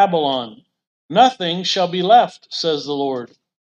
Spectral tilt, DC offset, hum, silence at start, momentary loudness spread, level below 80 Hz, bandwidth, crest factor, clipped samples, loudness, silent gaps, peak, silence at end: -4.5 dB/octave; under 0.1%; none; 0 s; 11 LU; -68 dBFS; 8.4 kHz; 18 dB; under 0.1%; -17 LUFS; 0.87-1.09 s; 0 dBFS; 0.45 s